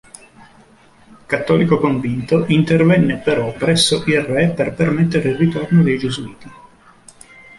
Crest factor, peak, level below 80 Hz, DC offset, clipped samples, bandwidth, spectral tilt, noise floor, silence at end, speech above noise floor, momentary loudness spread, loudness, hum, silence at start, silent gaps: 16 dB; -2 dBFS; -48 dBFS; under 0.1%; under 0.1%; 11.5 kHz; -6 dB/octave; -48 dBFS; 1.05 s; 32 dB; 7 LU; -16 LUFS; none; 1.3 s; none